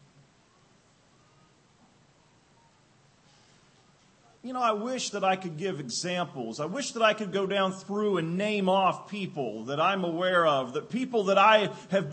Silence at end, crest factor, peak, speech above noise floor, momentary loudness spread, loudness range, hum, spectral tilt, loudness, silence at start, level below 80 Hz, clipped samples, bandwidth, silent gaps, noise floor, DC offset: 0 s; 22 dB; -8 dBFS; 35 dB; 11 LU; 8 LU; none; -4.5 dB/octave; -27 LUFS; 4.45 s; -78 dBFS; under 0.1%; 8.8 kHz; none; -62 dBFS; under 0.1%